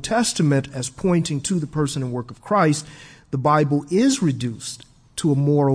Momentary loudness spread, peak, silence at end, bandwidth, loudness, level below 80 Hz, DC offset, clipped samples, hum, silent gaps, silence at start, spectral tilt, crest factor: 12 LU; -6 dBFS; 0 s; 11 kHz; -21 LUFS; -52 dBFS; under 0.1%; under 0.1%; none; none; 0 s; -5.5 dB/octave; 16 dB